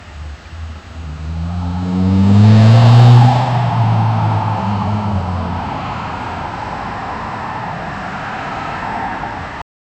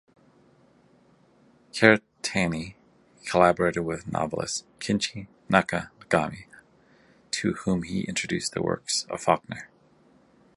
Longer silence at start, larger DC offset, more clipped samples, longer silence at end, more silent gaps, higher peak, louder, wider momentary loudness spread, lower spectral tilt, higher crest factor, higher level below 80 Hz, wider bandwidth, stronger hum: second, 0 s vs 1.75 s; neither; neither; second, 0.35 s vs 0.9 s; neither; about the same, 0 dBFS vs -2 dBFS; first, -14 LUFS vs -26 LUFS; first, 22 LU vs 14 LU; first, -8 dB/octave vs -4 dB/octave; second, 14 dB vs 26 dB; first, -34 dBFS vs -54 dBFS; second, 8.2 kHz vs 11.5 kHz; neither